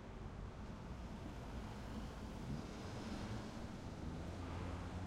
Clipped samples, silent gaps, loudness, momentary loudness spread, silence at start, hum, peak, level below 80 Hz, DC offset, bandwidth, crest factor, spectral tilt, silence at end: under 0.1%; none; -49 LUFS; 4 LU; 0 s; none; -34 dBFS; -54 dBFS; under 0.1%; 16 kHz; 14 dB; -6.5 dB/octave; 0 s